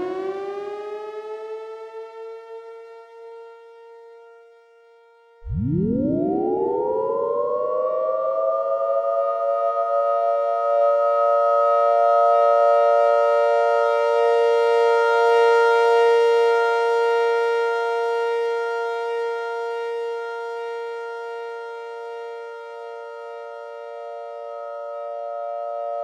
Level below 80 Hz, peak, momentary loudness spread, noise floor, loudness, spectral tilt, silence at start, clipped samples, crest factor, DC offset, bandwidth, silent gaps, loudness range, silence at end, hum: -52 dBFS; -6 dBFS; 19 LU; -53 dBFS; -20 LUFS; -6.5 dB/octave; 0 s; under 0.1%; 14 dB; under 0.1%; 9.8 kHz; none; 17 LU; 0 s; none